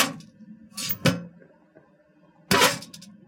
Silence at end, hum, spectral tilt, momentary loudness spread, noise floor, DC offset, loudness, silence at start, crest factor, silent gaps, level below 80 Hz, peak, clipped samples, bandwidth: 0.15 s; none; -3 dB/octave; 23 LU; -59 dBFS; under 0.1%; -24 LUFS; 0 s; 22 dB; none; -58 dBFS; -6 dBFS; under 0.1%; 17 kHz